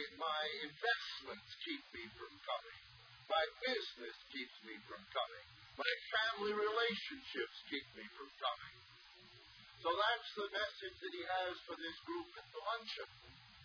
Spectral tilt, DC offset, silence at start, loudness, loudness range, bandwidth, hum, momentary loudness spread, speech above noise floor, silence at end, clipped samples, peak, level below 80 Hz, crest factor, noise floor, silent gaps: 0.5 dB/octave; under 0.1%; 0 s; -42 LUFS; 4 LU; 5.4 kHz; none; 19 LU; 20 dB; 0 s; under 0.1%; -18 dBFS; -78 dBFS; 26 dB; -62 dBFS; none